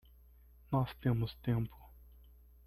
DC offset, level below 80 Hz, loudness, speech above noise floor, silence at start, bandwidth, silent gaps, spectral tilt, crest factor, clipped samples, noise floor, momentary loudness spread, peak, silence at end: under 0.1%; -56 dBFS; -36 LUFS; 26 dB; 0.7 s; 13.5 kHz; none; -9.5 dB/octave; 18 dB; under 0.1%; -61 dBFS; 3 LU; -20 dBFS; 0.8 s